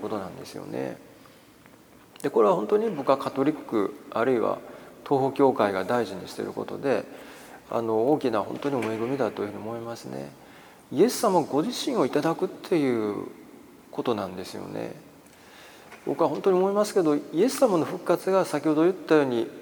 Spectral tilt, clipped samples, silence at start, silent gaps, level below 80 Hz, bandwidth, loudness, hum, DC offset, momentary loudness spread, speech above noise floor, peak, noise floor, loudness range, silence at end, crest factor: -5.5 dB/octave; under 0.1%; 0 s; none; -70 dBFS; over 20 kHz; -26 LUFS; none; under 0.1%; 16 LU; 28 dB; -6 dBFS; -53 dBFS; 5 LU; 0 s; 20 dB